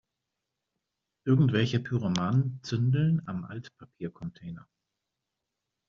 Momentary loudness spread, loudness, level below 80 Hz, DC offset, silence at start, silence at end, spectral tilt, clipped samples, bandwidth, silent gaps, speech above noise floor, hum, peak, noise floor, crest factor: 18 LU; -28 LUFS; -64 dBFS; under 0.1%; 1.25 s; 1.3 s; -7 dB/octave; under 0.1%; 7.2 kHz; none; 58 dB; none; -12 dBFS; -86 dBFS; 18 dB